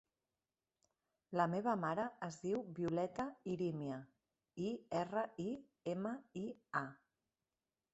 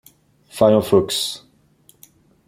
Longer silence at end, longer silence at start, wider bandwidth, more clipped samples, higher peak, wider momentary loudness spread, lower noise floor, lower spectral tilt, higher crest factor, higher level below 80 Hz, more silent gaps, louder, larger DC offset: about the same, 1 s vs 1.1 s; first, 1.3 s vs 0.55 s; second, 8.2 kHz vs 16.5 kHz; neither; second, -20 dBFS vs 0 dBFS; second, 9 LU vs 20 LU; first, under -90 dBFS vs -55 dBFS; first, -7 dB/octave vs -5 dB/octave; about the same, 22 dB vs 20 dB; second, -78 dBFS vs -56 dBFS; neither; second, -42 LUFS vs -17 LUFS; neither